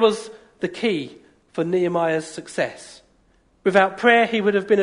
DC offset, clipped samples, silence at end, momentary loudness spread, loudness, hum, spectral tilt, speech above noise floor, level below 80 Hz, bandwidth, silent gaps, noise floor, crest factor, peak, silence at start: under 0.1%; under 0.1%; 0 s; 15 LU; -21 LUFS; none; -5 dB/octave; 40 dB; -64 dBFS; 11 kHz; none; -60 dBFS; 18 dB; -2 dBFS; 0 s